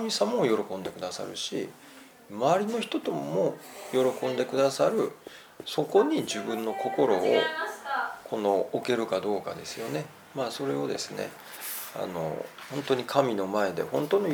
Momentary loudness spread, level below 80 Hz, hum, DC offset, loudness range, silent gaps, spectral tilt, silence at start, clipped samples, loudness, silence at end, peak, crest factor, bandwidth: 12 LU; -74 dBFS; none; under 0.1%; 5 LU; none; -4.5 dB/octave; 0 s; under 0.1%; -29 LUFS; 0 s; -8 dBFS; 20 dB; over 20 kHz